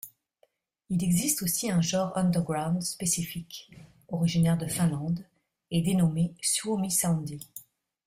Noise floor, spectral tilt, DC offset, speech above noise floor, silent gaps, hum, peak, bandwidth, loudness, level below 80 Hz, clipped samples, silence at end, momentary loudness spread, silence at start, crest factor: -69 dBFS; -5 dB/octave; under 0.1%; 42 dB; none; none; -10 dBFS; 16 kHz; -28 LUFS; -58 dBFS; under 0.1%; 0.45 s; 14 LU; 0.05 s; 18 dB